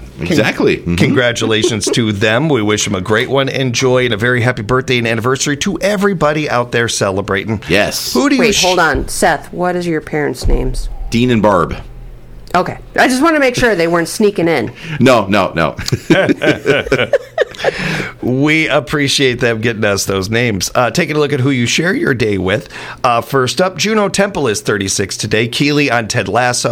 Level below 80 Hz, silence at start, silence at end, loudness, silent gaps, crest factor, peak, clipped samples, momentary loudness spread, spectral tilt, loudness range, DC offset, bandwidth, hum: -30 dBFS; 0 s; 0 s; -13 LUFS; none; 14 dB; 0 dBFS; under 0.1%; 6 LU; -4.5 dB/octave; 2 LU; under 0.1%; 18.5 kHz; none